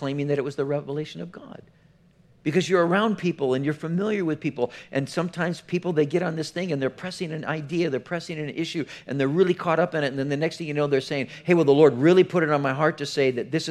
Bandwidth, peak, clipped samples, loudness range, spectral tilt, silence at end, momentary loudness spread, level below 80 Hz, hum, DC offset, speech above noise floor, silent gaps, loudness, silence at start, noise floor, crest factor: 12 kHz; -4 dBFS; under 0.1%; 6 LU; -6.5 dB/octave; 0 s; 12 LU; -68 dBFS; none; under 0.1%; 33 dB; none; -24 LUFS; 0 s; -57 dBFS; 20 dB